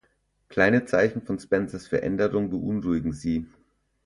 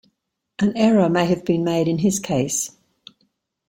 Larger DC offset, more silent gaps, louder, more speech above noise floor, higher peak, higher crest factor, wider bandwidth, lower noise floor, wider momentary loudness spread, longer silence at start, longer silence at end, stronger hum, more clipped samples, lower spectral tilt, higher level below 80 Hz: neither; neither; second, -25 LUFS vs -20 LUFS; second, 44 dB vs 54 dB; about the same, -6 dBFS vs -4 dBFS; about the same, 20 dB vs 16 dB; second, 11.5 kHz vs 16.5 kHz; about the same, -69 dBFS vs -72 dBFS; first, 10 LU vs 7 LU; about the same, 0.5 s vs 0.6 s; second, 0.6 s vs 1 s; neither; neither; first, -7 dB/octave vs -5.5 dB/octave; first, -50 dBFS vs -56 dBFS